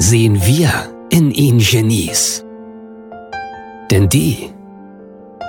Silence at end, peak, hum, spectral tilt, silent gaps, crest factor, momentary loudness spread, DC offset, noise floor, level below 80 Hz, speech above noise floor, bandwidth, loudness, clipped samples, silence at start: 0 s; 0 dBFS; none; -4.5 dB/octave; none; 14 dB; 22 LU; under 0.1%; -37 dBFS; -38 dBFS; 24 dB; 19 kHz; -13 LUFS; under 0.1%; 0 s